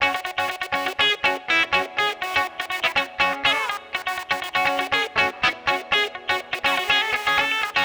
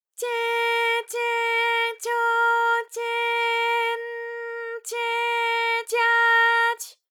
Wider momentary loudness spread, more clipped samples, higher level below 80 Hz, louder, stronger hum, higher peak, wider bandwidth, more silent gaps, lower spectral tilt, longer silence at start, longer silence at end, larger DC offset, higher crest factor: second, 7 LU vs 13 LU; neither; first, -56 dBFS vs under -90 dBFS; about the same, -21 LUFS vs -22 LUFS; neither; about the same, -8 dBFS vs -10 dBFS; about the same, over 20 kHz vs 19 kHz; neither; first, -1.5 dB/octave vs 4.5 dB/octave; second, 0 s vs 0.2 s; second, 0 s vs 0.2 s; neither; about the same, 16 dB vs 14 dB